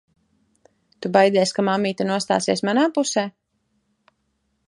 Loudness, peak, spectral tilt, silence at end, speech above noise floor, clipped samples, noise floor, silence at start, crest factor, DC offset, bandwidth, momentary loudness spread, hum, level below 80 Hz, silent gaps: -20 LUFS; -2 dBFS; -4.5 dB/octave; 1.4 s; 51 dB; under 0.1%; -71 dBFS; 1 s; 20 dB; under 0.1%; 11.5 kHz; 7 LU; none; -68 dBFS; none